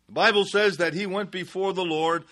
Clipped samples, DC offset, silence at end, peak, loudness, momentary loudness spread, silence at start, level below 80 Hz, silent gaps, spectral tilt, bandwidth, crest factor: under 0.1%; under 0.1%; 0.1 s; -6 dBFS; -24 LUFS; 9 LU; 0.1 s; -70 dBFS; none; -4 dB/octave; 12 kHz; 18 dB